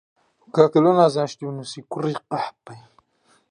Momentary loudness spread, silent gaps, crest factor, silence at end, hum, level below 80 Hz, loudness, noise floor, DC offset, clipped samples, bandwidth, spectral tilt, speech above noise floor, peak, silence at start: 16 LU; none; 20 dB; 0.7 s; none; -72 dBFS; -21 LUFS; -62 dBFS; under 0.1%; under 0.1%; 10.5 kHz; -7 dB/octave; 42 dB; -2 dBFS; 0.55 s